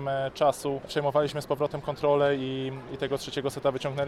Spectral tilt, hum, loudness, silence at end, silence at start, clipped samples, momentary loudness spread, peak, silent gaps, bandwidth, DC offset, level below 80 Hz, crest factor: -5.5 dB/octave; none; -28 LUFS; 0 s; 0 s; under 0.1%; 8 LU; -10 dBFS; none; 14 kHz; under 0.1%; -58 dBFS; 18 dB